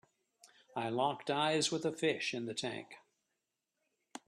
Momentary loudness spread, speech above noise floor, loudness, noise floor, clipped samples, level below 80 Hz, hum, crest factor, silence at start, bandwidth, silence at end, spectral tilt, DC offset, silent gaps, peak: 14 LU; 51 dB; -36 LUFS; -87 dBFS; under 0.1%; -80 dBFS; none; 20 dB; 0.45 s; 13 kHz; 0.1 s; -3.5 dB/octave; under 0.1%; none; -20 dBFS